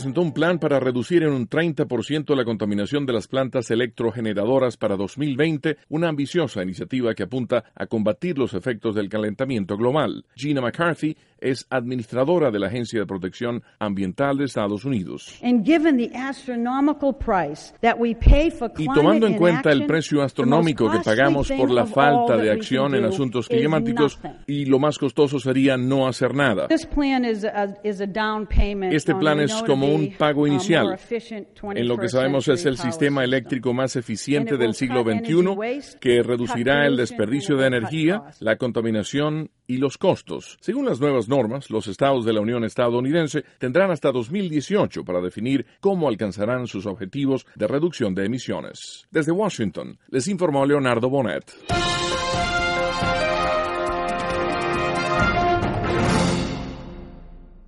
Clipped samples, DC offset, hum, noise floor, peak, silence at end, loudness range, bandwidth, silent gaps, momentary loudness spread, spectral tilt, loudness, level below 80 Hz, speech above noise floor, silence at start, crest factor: under 0.1%; under 0.1%; none; -42 dBFS; -2 dBFS; 0.1 s; 5 LU; 11.5 kHz; none; 9 LU; -6 dB/octave; -22 LUFS; -36 dBFS; 21 dB; 0 s; 20 dB